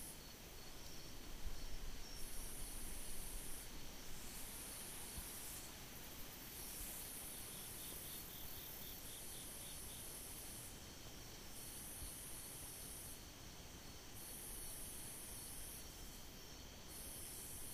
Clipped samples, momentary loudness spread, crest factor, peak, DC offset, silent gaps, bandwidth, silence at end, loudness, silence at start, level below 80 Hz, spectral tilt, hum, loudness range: under 0.1%; 6 LU; 18 dB; -32 dBFS; under 0.1%; none; 15.5 kHz; 0 s; -51 LUFS; 0 s; -56 dBFS; -2 dB/octave; none; 2 LU